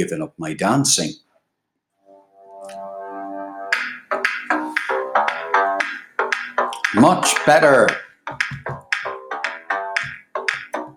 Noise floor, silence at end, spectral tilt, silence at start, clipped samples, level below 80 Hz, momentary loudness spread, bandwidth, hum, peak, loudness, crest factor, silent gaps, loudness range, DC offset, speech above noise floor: -76 dBFS; 0.05 s; -3.5 dB/octave; 0 s; under 0.1%; -62 dBFS; 17 LU; 19 kHz; none; 0 dBFS; -19 LUFS; 20 dB; none; 9 LU; under 0.1%; 59 dB